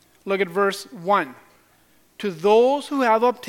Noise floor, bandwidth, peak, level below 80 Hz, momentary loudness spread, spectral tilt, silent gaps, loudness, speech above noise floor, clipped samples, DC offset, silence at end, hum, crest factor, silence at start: -58 dBFS; 16.5 kHz; -4 dBFS; -72 dBFS; 13 LU; -5 dB/octave; none; -21 LUFS; 38 dB; under 0.1%; under 0.1%; 0 s; none; 18 dB; 0.25 s